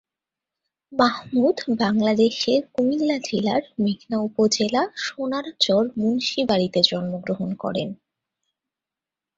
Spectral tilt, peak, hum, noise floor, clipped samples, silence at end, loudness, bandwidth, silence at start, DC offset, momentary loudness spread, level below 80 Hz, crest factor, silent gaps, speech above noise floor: -4.5 dB/octave; -2 dBFS; none; -89 dBFS; under 0.1%; 1.45 s; -22 LUFS; 7.8 kHz; 0.9 s; under 0.1%; 8 LU; -62 dBFS; 22 dB; none; 67 dB